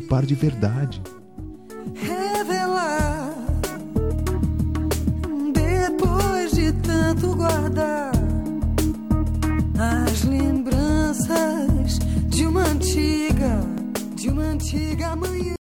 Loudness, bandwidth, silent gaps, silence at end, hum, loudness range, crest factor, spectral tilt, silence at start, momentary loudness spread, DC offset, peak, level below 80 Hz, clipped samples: -22 LUFS; 18 kHz; none; 0.1 s; none; 4 LU; 14 dB; -6 dB/octave; 0 s; 6 LU; 0.3%; -8 dBFS; -30 dBFS; under 0.1%